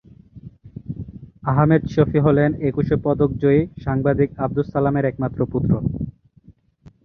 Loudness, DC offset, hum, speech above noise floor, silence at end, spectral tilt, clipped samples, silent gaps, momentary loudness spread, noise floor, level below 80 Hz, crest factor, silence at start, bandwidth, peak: -20 LUFS; under 0.1%; none; 33 dB; 0.55 s; -10.5 dB/octave; under 0.1%; none; 16 LU; -51 dBFS; -40 dBFS; 18 dB; 0.35 s; 6.2 kHz; -2 dBFS